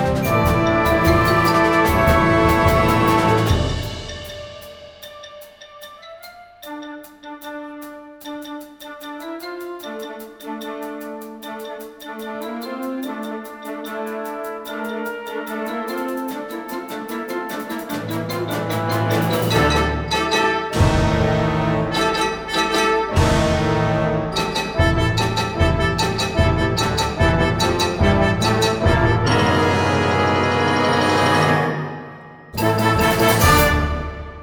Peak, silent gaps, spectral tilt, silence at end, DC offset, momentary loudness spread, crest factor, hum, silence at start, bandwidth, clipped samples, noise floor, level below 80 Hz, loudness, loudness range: -2 dBFS; none; -5.5 dB/octave; 0 s; under 0.1%; 19 LU; 18 dB; none; 0 s; over 20 kHz; under 0.1%; -41 dBFS; -32 dBFS; -18 LUFS; 16 LU